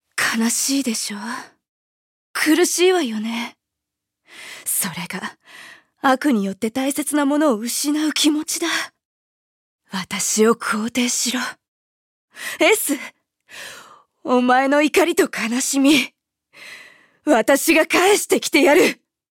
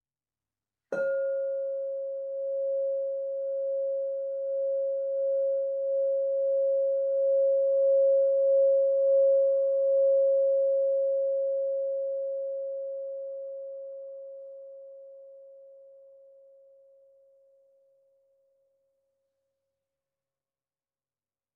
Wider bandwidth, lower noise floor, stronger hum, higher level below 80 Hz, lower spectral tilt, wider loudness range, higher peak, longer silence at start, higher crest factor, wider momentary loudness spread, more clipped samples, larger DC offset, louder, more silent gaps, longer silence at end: first, 17 kHz vs 1.6 kHz; second, -82 dBFS vs under -90 dBFS; neither; first, -64 dBFS vs under -90 dBFS; second, -2.5 dB/octave vs -5 dB/octave; second, 5 LU vs 16 LU; first, -2 dBFS vs -18 dBFS; second, 0.15 s vs 0.9 s; first, 18 dB vs 10 dB; about the same, 17 LU vs 16 LU; neither; neither; first, -18 LUFS vs -27 LUFS; first, 1.69-2.34 s, 9.05-9.79 s, 11.68-12.28 s vs none; second, 0.35 s vs 5.75 s